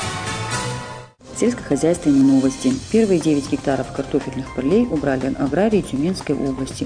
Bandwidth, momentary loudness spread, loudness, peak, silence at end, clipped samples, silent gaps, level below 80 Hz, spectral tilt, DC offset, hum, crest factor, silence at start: 10 kHz; 9 LU; -20 LUFS; -6 dBFS; 0 s; under 0.1%; none; -42 dBFS; -5.5 dB/octave; under 0.1%; none; 14 dB; 0 s